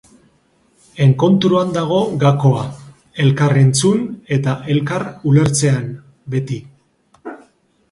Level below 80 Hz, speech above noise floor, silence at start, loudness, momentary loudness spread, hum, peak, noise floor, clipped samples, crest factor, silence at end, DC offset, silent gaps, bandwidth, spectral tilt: -52 dBFS; 43 dB; 0.95 s; -16 LUFS; 19 LU; none; 0 dBFS; -57 dBFS; under 0.1%; 16 dB; 0.55 s; under 0.1%; none; 11.5 kHz; -6 dB/octave